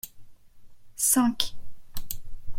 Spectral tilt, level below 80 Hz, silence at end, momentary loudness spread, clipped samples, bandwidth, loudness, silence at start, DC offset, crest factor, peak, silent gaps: -1.5 dB/octave; -44 dBFS; 0 s; 22 LU; under 0.1%; 16.5 kHz; -25 LUFS; 0.05 s; under 0.1%; 22 dB; -6 dBFS; none